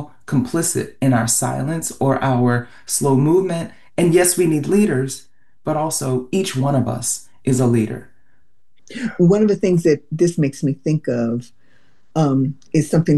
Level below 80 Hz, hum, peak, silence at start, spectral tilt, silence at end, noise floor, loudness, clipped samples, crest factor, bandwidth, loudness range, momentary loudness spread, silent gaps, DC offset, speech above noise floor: -50 dBFS; none; -4 dBFS; 0 s; -5.5 dB/octave; 0 s; -66 dBFS; -18 LUFS; under 0.1%; 16 dB; 13 kHz; 3 LU; 9 LU; none; 0.8%; 48 dB